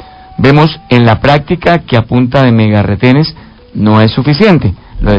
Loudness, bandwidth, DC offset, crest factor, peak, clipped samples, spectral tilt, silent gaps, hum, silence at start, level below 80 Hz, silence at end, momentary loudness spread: -8 LUFS; 8 kHz; under 0.1%; 8 dB; 0 dBFS; 2%; -8.5 dB/octave; none; none; 0 s; -26 dBFS; 0 s; 8 LU